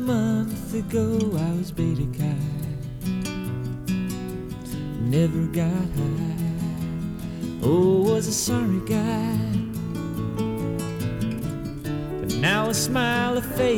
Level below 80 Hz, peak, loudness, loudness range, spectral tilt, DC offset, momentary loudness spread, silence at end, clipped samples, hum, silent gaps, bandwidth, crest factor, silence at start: -42 dBFS; -10 dBFS; -25 LUFS; 4 LU; -5.5 dB/octave; under 0.1%; 9 LU; 0 s; under 0.1%; none; none; 18.5 kHz; 14 dB; 0 s